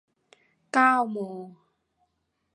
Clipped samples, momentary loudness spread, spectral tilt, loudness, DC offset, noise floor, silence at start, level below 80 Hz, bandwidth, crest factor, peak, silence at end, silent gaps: under 0.1%; 17 LU; -5 dB/octave; -24 LUFS; under 0.1%; -76 dBFS; 0.75 s; -84 dBFS; 11 kHz; 22 dB; -8 dBFS; 1.05 s; none